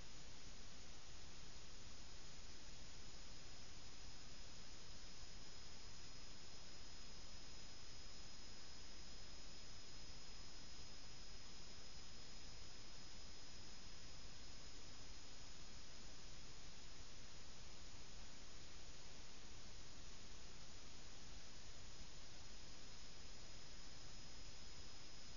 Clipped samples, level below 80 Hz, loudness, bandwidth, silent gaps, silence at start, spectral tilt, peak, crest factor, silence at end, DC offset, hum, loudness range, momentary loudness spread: under 0.1%; -64 dBFS; -58 LUFS; 7.2 kHz; none; 0 s; -2.5 dB/octave; -40 dBFS; 14 dB; 0 s; 0.4%; none; 1 LU; 1 LU